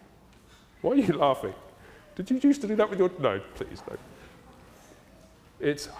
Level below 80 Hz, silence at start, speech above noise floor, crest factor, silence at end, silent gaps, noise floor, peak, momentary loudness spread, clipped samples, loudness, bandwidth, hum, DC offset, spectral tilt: -58 dBFS; 0.85 s; 29 dB; 20 dB; 0 s; none; -55 dBFS; -10 dBFS; 18 LU; under 0.1%; -27 LUFS; 15 kHz; none; under 0.1%; -6 dB/octave